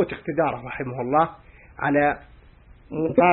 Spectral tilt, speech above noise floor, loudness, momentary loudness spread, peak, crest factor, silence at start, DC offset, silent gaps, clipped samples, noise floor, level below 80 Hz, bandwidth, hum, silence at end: -11.5 dB/octave; 28 dB; -24 LUFS; 10 LU; -4 dBFS; 18 dB; 0 s; under 0.1%; none; under 0.1%; -50 dBFS; -52 dBFS; 4.2 kHz; none; 0 s